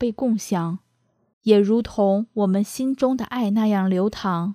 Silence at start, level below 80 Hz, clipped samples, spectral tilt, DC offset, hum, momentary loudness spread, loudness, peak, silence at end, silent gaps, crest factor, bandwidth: 0 s; -52 dBFS; under 0.1%; -7 dB/octave; under 0.1%; none; 7 LU; -21 LUFS; -4 dBFS; 0 s; 1.33-1.41 s; 18 dB; 15 kHz